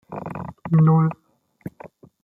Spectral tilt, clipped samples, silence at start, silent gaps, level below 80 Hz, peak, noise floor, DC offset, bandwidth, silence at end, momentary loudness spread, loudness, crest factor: -12 dB/octave; under 0.1%; 0.1 s; none; -60 dBFS; -8 dBFS; -46 dBFS; under 0.1%; 2.8 kHz; 0.35 s; 23 LU; -19 LUFS; 14 dB